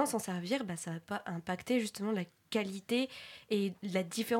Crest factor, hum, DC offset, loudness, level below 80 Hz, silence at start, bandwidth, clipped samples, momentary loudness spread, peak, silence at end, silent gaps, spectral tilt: 18 dB; none; under 0.1%; -36 LUFS; -78 dBFS; 0 s; 16.5 kHz; under 0.1%; 6 LU; -18 dBFS; 0 s; none; -4.5 dB/octave